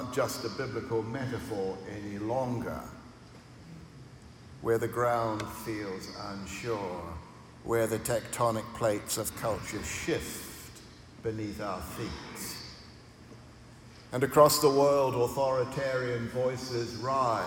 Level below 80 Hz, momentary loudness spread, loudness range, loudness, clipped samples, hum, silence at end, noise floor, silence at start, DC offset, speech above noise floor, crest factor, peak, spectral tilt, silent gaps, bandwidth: -56 dBFS; 23 LU; 11 LU; -31 LUFS; under 0.1%; none; 0 s; -51 dBFS; 0 s; under 0.1%; 21 dB; 24 dB; -8 dBFS; -4.5 dB/octave; none; 17.5 kHz